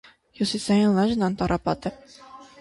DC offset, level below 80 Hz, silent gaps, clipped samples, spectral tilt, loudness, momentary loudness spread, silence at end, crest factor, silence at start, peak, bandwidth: under 0.1%; -48 dBFS; none; under 0.1%; -6 dB/octave; -24 LUFS; 9 LU; 0.15 s; 16 dB; 0.4 s; -8 dBFS; 11.5 kHz